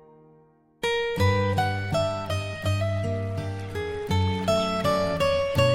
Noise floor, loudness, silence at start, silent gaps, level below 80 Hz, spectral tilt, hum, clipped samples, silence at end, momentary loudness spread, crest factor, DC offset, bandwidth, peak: -58 dBFS; -26 LUFS; 0.8 s; none; -48 dBFS; -6 dB/octave; none; under 0.1%; 0 s; 8 LU; 16 dB; under 0.1%; 16 kHz; -8 dBFS